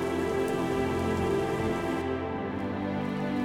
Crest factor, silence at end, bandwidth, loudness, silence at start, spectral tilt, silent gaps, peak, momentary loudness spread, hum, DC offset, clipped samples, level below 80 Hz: 12 dB; 0 s; 17.5 kHz; -30 LUFS; 0 s; -6.5 dB/octave; none; -18 dBFS; 4 LU; none; under 0.1%; under 0.1%; -50 dBFS